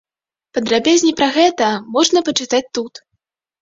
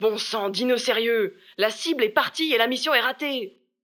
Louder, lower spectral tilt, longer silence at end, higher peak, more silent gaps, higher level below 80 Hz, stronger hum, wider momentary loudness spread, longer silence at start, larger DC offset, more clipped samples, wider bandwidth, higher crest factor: first, -16 LUFS vs -23 LUFS; about the same, -2.5 dB/octave vs -2.5 dB/octave; first, 0.75 s vs 0.35 s; about the same, -2 dBFS vs -4 dBFS; neither; first, -58 dBFS vs -84 dBFS; neither; first, 12 LU vs 7 LU; first, 0.55 s vs 0 s; neither; neither; second, 7.8 kHz vs 20 kHz; about the same, 16 dB vs 20 dB